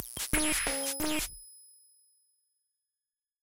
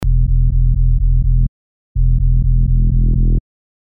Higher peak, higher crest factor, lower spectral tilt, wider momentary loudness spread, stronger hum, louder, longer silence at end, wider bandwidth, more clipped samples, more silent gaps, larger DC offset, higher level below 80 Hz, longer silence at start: second, -14 dBFS vs -4 dBFS; first, 22 dB vs 8 dB; second, -1.5 dB/octave vs -12 dB/octave; first, 17 LU vs 5 LU; neither; second, -30 LUFS vs -17 LUFS; second, 0.05 s vs 0.5 s; first, 17 kHz vs 0.8 kHz; neither; second, none vs 1.48-1.95 s; neither; second, -48 dBFS vs -14 dBFS; about the same, 0 s vs 0 s